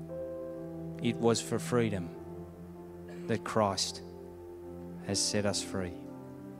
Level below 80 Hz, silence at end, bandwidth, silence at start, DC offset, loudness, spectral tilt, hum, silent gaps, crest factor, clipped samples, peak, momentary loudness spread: -62 dBFS; 0 s; 16 kHz; 0 s; under 0.1%; -33 LUFS; -4 dB/octave; none; none; 22 dB; under 0.1%; -14 dBFS; 18 LU